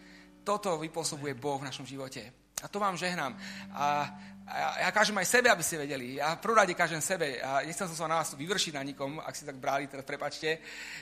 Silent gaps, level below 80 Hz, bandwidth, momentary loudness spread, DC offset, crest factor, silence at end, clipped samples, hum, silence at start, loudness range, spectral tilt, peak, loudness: none; -68 dBFS; 15.5 kHz; 15 LU; under 0.1%; 24 dB; 0 s; under 0.1%; none; 0 s; 7 LU; -2.5 dB/octave; -8 dBFS; -31 LUFS